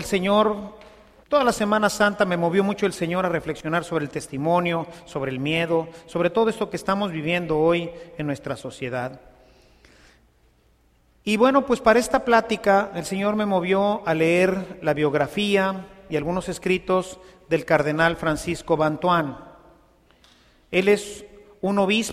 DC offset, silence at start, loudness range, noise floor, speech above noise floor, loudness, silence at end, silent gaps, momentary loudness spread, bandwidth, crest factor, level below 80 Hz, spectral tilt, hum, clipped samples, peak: under 0.1%; 0 s; 5 LU; -60 dBFS; 38 dB; -22 LUFS; 0 s; none; 11 LU; 15 kHz; 20 dB; -52 dBFS; -5.5 dB/octave; none; under 0.1%; -4 dBFS